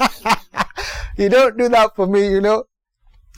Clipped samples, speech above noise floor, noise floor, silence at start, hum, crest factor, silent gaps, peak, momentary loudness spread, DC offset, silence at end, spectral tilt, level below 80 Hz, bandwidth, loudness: under 0.1%; 39 dB; -53 dBFS; 0 s; none; 10 dB; none; -6 dBFS; 10 LU; under 0.1%; 0.75 s; -4.5 dB/octave; -38 dBFS; 17 kHz; -16 LUFS